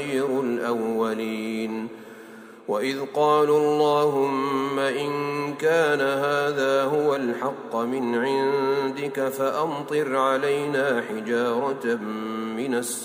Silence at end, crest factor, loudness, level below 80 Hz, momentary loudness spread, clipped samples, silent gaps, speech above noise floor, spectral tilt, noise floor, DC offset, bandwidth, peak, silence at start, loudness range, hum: 0 s; 16 dB; -24 LUFS; -74 dBFS; 9 LU; under 0.1%; none; 20 dB; -4.5 dB/octave; -44 dBFS; under 0.1%; 16 kHz; -8 dBFS; 0 s; 3 LU; none